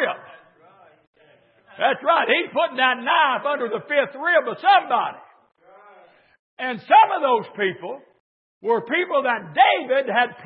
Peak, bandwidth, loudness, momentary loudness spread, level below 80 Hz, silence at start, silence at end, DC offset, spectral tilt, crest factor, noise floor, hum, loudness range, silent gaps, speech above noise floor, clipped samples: -2 dBFS; 4.9 kHz; -20 LUFS; 12 LU; -82 dBFS; 0 s; 0 s; under 0.1%; -8 dB/octave; 20 dB; -56 dBFS; none; 3 LU; 1.07-1.13 s, 6.39-6.57 s, 8.20-8.61 s; 36 dB; under 0.1%